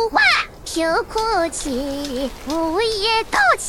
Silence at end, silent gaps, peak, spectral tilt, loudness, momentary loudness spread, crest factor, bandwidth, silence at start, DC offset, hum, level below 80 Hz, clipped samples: 0 s; none; -2 dBFS; -2 dB/octave; -19 LUFS; 10 LU; 16 dB; 17.5 kHz; 0 s; under 0.1%; none; -40 dBFS; under 0.1%